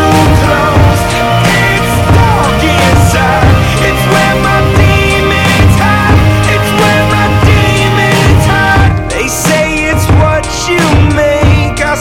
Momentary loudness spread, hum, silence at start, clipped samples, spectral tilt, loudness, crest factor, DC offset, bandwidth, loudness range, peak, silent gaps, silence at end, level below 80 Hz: 3 LU; none; 0 s; under 0.1%; -5 dB/octave; -8 LUFS; 8 dB; under 0.1%; 17 kHz; 1 LU; 0 dBFS; none; 0 s; -18 dBFS